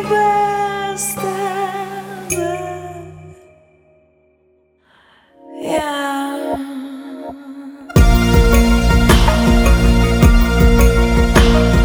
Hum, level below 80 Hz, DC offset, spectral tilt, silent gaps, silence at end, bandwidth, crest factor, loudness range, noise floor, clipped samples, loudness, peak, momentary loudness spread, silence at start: none; -18 dBFS; under 0.1%; -5.5 dB/octave; none; 0 s; over 20 kHz; 14 dB; 15 LU; -57 dBFS; under 0.1%; -15 LUFS; 0 dBFS; 18 LU; 0 s